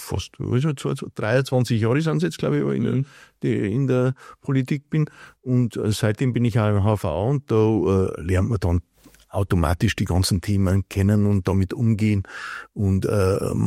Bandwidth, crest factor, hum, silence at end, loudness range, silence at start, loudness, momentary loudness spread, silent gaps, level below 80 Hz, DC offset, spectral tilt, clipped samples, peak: 15 kHz; 18 dB; none; 0 s; 2 LU; 0 s; -22 LUFS; 7 LU; none; -44 dBFS; under 0.1%; -7 dB/octave; under 0.1%; -4 dBFS